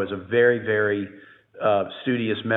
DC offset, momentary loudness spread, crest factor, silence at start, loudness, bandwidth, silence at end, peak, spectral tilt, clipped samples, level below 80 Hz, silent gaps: under 0.1%; 7 LU; 18 dB; 0 s; -23 LUFS; 4.1 kHz; 0 s; -6 dBFS; -9.5 dB/octave; under 0.1%; -72 dBFS; none